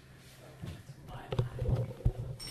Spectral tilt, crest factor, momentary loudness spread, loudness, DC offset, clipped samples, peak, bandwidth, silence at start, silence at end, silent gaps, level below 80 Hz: -7 dB/octave; 22 dB; 19 LU; -37 LUFS; under 0.1%; under 0.1%; -16 dBFS; 13.5 kHz; 0 s; 0 s; none; -44 dBFS